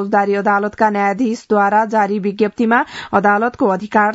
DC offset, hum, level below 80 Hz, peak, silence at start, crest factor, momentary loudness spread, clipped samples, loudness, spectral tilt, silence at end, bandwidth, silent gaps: under 0.1%; none; -58 dBFS; 0 dBFS; 0 s; 16 dB; 4 LU; under 0.1%; -16 LUFS; -6.5 dB/octave; 0 s; 8 kHz; none